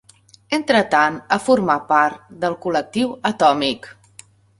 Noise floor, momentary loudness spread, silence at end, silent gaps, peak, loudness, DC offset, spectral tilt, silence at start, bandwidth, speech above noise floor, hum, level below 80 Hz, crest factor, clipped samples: -50 dBFS; 8 LU; 0.7 s; none; -2 dBFS; -18 LUFS; under 0.1%; -4.5 dB/octave; 0.5 s; 11.5 kHz; 32 dB; none; -60 dBFS; 18 dB; under 0.1%